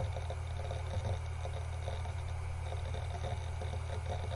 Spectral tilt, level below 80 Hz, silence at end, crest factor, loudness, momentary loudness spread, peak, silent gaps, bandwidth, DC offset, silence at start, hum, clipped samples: -6 dB/octave; -46 dBFS; 0 s; 12 dB; -40 LUFS; 2 LU; -26 dBFS; none; 11.5 kHz; under 0.1%; 0 s; none; under 0.1%